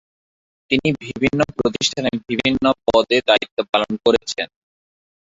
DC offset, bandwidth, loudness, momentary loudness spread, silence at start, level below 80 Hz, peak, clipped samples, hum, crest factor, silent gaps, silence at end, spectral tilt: under 0.1%; 7.8 kHz; -19 LUFS; 6 LU; 0.7 s; -50 dBFS; -2 dBFS; under 0.1%; none; 18 dB; 3.51-3.57 s, 3.69-3.73 s; 0.85 s; -4 dB/octave